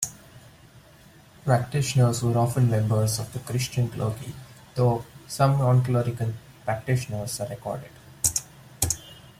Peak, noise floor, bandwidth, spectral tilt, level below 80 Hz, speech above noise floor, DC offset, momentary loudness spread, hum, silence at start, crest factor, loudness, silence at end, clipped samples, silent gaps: -4 dBFS; -52 dBFS; 16 kHz; -5.5 dB/octave; -52 dBFS; 28 dB; under 0.1%; 13 LU; none; 0 s; 20 dB; -25 LUFS; 0.2 s; under 0.1%; none